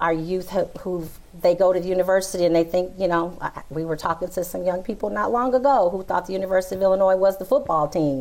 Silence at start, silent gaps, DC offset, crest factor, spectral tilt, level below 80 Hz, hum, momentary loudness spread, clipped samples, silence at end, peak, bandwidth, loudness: 0 s; none; under 0.1%; 12 dB; -6 dB/octave; -48 dBFS; none; 10 LU; under 0.1%; 0 s; -10 dBFS; 16.5 kHz; -22 LUFS